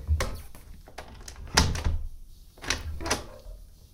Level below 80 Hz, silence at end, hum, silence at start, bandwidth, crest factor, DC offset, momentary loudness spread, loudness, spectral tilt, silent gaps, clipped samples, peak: -36 dBFS; 0.1 s; none; 0 s; 17.5 kHz; 30 dB; under 0.1%; 24 LU; -29 LUFS; -3 dB/octave; none; under 0.1%; -2 dBFS